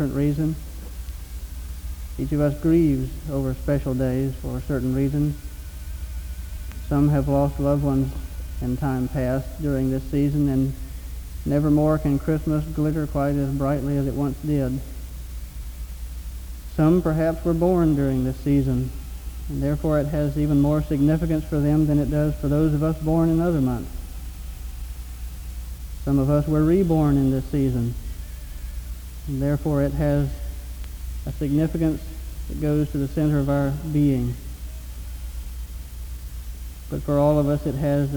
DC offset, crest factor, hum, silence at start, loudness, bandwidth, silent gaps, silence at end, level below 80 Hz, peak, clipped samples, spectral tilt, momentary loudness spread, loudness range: under 0.1%; 14 dB; none; 0 s; -23 LUFS; over 20 kHz; none; 0 s; -32 dBFS; -8 dBFS; under 0.1%; -8.5 dB/octave; 17 LU; 5 LU